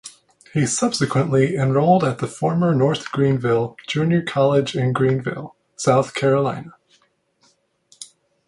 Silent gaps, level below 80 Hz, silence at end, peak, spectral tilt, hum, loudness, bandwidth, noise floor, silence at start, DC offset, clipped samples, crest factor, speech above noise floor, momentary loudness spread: none; -56 dBFS; 0.4 s; -2 dBFS; -6 dB/octave; none; -19 LUFS; 11.5 kHz; -62 dBFS; 0.05 s; under 0.1%; under 0.1%; 18 dB; 43 dB; 16 LU